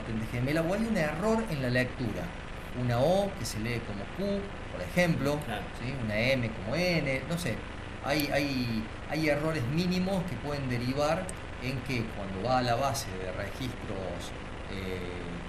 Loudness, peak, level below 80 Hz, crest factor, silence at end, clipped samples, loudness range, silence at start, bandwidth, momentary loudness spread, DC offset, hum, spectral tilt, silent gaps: -31 LUFS; -14 dBFS; -44 dBFS; 18 dB; 0 s; under 0.1%; 2 LU; 0 s; 13 kHz; 10 LU; under 0.1%; none; -5.5 dB/octave; none